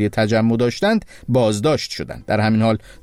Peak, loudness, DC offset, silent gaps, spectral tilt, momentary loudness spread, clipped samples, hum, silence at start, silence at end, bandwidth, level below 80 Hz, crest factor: -6 dBFS; -19 LUFS; under 0.1%; none; -6 dB/octave; 6 LU; under 0.1%; none; 0 s; 0.1 s; 13.5 kHz; -46 dBFS; 12 dB